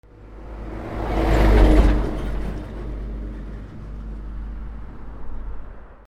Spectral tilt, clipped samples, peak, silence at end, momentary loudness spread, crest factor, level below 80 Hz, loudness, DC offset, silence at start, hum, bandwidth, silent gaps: -7.5 dB/octave; under 0.1%; -2 dBFS; 0.05 s; 23 LU; 20 dB; -24 dBFS; -22 LUFS; under 0.1%; 0.15 s; none; 7.8 kHz; none